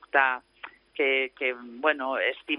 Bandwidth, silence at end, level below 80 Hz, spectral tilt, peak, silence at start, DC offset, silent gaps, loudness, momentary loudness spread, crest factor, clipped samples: 5.4 kHz; 0 s; -74 dBFS; -4.5 dB/octave; -6 dBFS; 0.15 s; under 0.1%; none; -26 LUFS; 16 LU; 22 dB; under 0.1%